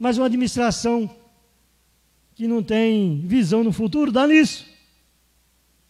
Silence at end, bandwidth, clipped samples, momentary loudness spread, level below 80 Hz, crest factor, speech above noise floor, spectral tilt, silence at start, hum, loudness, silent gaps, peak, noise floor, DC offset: 1.25 s; 12.5 kHz; under 0.1%; 9 LU; -52 dBFS; 18 dB; 43 dB; -5.5 dB/octave; 0 s; none; -20 LUFS; none; -4 dBFS; -62 dBFS; under 0.1%